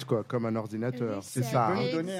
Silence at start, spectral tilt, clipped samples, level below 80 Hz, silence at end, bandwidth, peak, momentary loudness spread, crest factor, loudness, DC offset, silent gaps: 0 s; -6.5 dB/octave; under 0.1%; -70 dBFS; 0 s; 16 kHz; -14 dBFS; 6 LU; 16 dB; -30 LUFS; under 0.1%; none